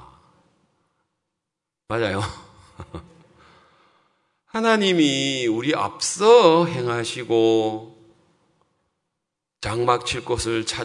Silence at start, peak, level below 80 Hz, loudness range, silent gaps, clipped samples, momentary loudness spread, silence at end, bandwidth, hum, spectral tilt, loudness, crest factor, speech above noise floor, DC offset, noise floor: 1.9 s; 0 dBFS; -52 dBFS; 13 LU; none; under 0.1%; 17 LU; 0 s; 11 kHz; none; -4 dB/octave; -20 LUFS; 22 dB; 64 dB; under 0.1%; -84 dBFS